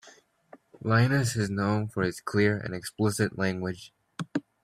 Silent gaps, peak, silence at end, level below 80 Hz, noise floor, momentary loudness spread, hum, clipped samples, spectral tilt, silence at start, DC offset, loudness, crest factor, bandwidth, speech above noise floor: none; -8 dBFS; 0.25 s; -62 dBFS; -57 dBFS; 12 LU; none; under 0.1%; -6 dB/octave; 0.05 s; under 0.1%; -28 LUFS; 20 dB; 15 kHz; 30 dB